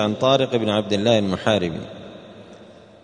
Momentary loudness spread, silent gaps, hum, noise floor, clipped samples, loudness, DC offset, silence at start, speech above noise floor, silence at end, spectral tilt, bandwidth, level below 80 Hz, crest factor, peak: 20 LU; none; none; -45 dBFS; under 0.1%; -20 LUFS; under 0.1%; 0 s; 25 dB; 0.3 s; -5.5 dB/octave; 10 kHz; -56 dBFS; 18 dB; -4 dBFS